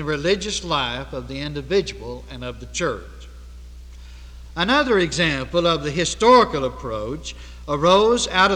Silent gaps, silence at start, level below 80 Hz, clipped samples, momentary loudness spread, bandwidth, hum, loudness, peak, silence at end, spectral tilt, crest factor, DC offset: none; 0 s; -38 dBFS; under 0.1%; 18 LU; 11.5 kHz; 60 Hz at -40 dBFS; -20 LUFS; -2 dBFS; 0 s; -4 dB/octave; 18 dB; under 0.1%